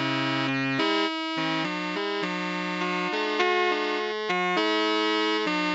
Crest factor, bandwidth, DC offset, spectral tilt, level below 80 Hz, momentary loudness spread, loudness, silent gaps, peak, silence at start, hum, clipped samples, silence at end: 18 dB; 8.2 kHz; under 0.1%; -4.5 dB/octave; -82 dBFS; 5 LU; -26 LUFS; none; -8 dBFS; 0 s; none; under 0.1%; 0 s